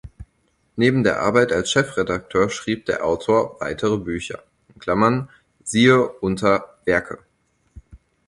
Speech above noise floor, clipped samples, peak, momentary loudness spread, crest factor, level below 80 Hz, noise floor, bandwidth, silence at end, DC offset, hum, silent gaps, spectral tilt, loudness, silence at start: 46 dB; under 0.1%; -2 dBFS; 16 LU; 18 dB; -48 dBFS; -65 dBFS; 11.5 kHz; 0.3 s; under 0.1%; none; none; -5 dB/octave; -20 LUFS; 0.05 s